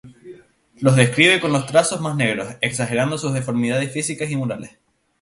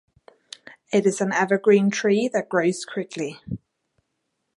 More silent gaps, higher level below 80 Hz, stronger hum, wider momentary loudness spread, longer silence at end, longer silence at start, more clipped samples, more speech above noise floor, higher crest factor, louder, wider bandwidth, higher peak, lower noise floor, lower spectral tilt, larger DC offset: neither; about the same, -56 dBFS vs -60 dBFS; neither; second, 10 LU vs 22 LU; second, 0.55 s vs 1 s; second, 0.05 s vs 0.9 s; neither; second, 26 dB vs 55 dB; about the same, 20 dB vs 18 dB; first, -19 LUFS vs -22 LUFS; about the same, 11.5 kHz vs 11.5 kHz; first, 0 dBFS vs -4 dBFS; second, -45 dBFS vs -76 dBFS; about the same, -4.5 dB/octave vs -5 dB/octave; neither